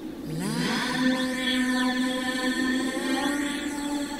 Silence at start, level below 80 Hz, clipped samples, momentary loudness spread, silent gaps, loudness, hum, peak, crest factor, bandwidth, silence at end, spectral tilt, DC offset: 0 s; -54 dBFS; under 0.1%; 5 LU; none; -26 LUFS; none; -12 dBFS; 14 dB; 16 kHz; 0 s; -3.5 dB/octave; under 0.1%